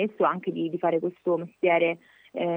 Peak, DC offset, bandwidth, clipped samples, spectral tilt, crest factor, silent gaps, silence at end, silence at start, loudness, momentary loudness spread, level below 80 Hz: -10 dBFS; under 0.1%; 3.7 kHz; under 0.1%; -8.5 dB/octave; 16 dB; none; 0 s; 0 s; -26 LUFS; 8 LU; -84 dBFS